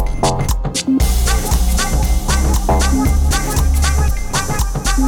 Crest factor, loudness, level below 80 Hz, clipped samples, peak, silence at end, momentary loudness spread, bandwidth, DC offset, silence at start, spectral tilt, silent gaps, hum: 10 dB; -16 LUFS; -16 dBFS; under 0.1%; -4 dBFS; 0 s; 4 LU; 18.5 kHz; under 0.1%; 0 s; -4.5 dB/octave; none; none